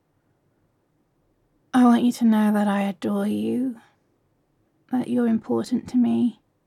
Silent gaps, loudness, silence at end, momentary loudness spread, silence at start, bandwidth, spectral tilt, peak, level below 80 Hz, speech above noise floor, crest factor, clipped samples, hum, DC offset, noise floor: none; -22 LUFS; 0.35 s; 10 LU; 1.75 s; 13.5 kHz; -6.5 dB/octave; -8 dBFS; -70 dBFS; 46 dB; 16 dB; under 0.1%; none; under 0.1%; -68 dBFS